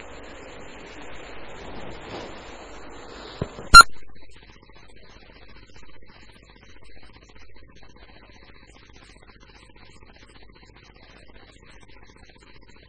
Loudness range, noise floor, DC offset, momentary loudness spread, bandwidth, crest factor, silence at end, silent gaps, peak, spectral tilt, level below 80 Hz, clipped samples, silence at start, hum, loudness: 22 LU; -49 dBFS; under 0.1%; 33 LU; 11 kHz; 26 dB; 6.9 s; none; 0 dBFS; -1 dB/octave; -42 dBFS; 0.2%; 1.1 s; none; -10 LUFS